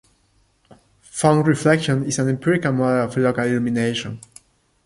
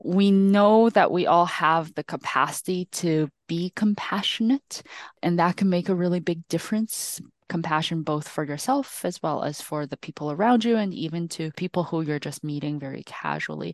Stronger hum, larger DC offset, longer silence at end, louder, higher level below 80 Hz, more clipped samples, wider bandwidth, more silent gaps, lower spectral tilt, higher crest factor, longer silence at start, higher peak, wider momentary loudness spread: neither; neither; first, 0.65 s vs 0 s; first, -19 LUFS vs -24 LUFS; first, -56 dBFS vs -70 dBFS; neither; about the same, 11.5 kHz vs 12.5 kHz; neither; about the same, -5.5 dB/octave vs -5.5 dB/octave; about the same, 18 dB vs 18 dB; first, 1.15 s vs 0.05 s; first, -2 dBFS vs -6 dBFS; second, 9 LU vs 12 LU